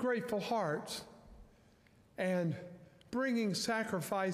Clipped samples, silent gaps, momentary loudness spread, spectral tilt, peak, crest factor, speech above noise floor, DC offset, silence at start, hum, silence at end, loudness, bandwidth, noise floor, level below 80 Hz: under 0.1%; none; 18 LU; -5 dB/octave; -24 dBFS; 14 dB; 30 dB; under 0.1%; 0 s; none; 0 s; -37 LUFS; 15.5 kHz; -65 dBFS; -68 dBFS